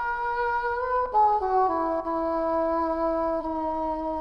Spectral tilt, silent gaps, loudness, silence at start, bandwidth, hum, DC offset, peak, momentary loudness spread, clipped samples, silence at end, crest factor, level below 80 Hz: -7 dB/octave; none; -26 LUFS; 0 s; 6.2 kHz; none; under 0.1%; -12 dBFS; 6 LU; under 0.1%; 0 s; 12 dB; -48 dBFS